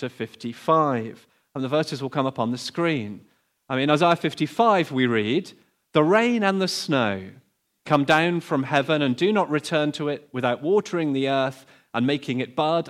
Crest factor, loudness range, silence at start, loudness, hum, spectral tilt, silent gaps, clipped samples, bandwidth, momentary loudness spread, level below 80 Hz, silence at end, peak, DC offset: 18 dB; 4 LU; 0 s; -23 LUFS; none; -5.5 dB/octave; none; under 0.1%; 14.5 kHz; 11 LU; -70 dBFS; 0 s; -4 dBFS; under 0.1%